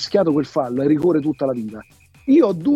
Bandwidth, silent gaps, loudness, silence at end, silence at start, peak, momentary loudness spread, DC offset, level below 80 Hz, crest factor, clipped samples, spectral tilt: 8.8 kHz; none; -18 LUFS; 0 s; 0 s; -4 dBFS; 15 LU; under 0.1%; -56 dBFS; 14 dB; under 0.1%; -7 dB/octave